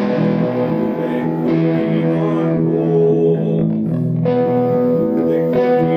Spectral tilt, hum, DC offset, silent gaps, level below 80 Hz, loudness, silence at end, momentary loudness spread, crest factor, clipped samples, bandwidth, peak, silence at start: -10.5 dB/octave; none; under 0.1%; none; -54 dBFS; -16 LUFS; 0 s; 4 LU; 10 dB; under 0.1%; 5.6 kHz; -4 dBFS; 0 s